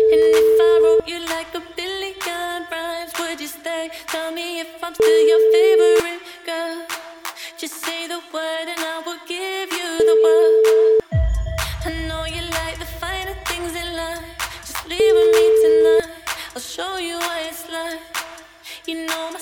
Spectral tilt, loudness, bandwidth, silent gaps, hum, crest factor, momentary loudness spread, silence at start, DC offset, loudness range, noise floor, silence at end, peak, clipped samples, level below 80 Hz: -4 dB/octave; -19 LUFS; 18 kHz; none; none; 14 dB; 15 LU; 0 s; under 0.1%; 9 LU; -39 dBFS; 0 s; -4 dBFS; under 0.1%; -36 dBFS